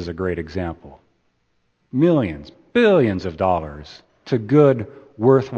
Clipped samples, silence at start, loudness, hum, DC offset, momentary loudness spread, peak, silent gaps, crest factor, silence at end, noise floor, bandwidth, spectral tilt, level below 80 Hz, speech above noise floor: under 0.1%; 0 s; -19 LUFS; none; under 0.1%; 19 LU; 0 dBFS; none; 18 dB; 0 s; -67 dBFS; 7.2 kHz; -8.5 dB/octave; -48 dBFS; 48 dB